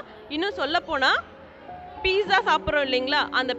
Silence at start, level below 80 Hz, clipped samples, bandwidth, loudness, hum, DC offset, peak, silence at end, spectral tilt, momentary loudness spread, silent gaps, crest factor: 0 s; -50 dBFS; under 0.1%; 8.2 kHz; -23 LUFS; none; under 0.1%; -6 dBFS; 0 s; -3.5 dB/octave; 13 LU; none; 18 dB